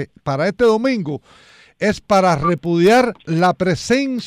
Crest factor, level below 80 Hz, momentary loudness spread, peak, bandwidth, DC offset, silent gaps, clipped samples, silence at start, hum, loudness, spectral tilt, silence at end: 12 dB; -46 dBFS; 9 LU; -4 dBFS; 15.5 kHz; under 0.1%; none; under 0.1%; 0 s; none; -17 LUFS; -6 dB/octave; 0 s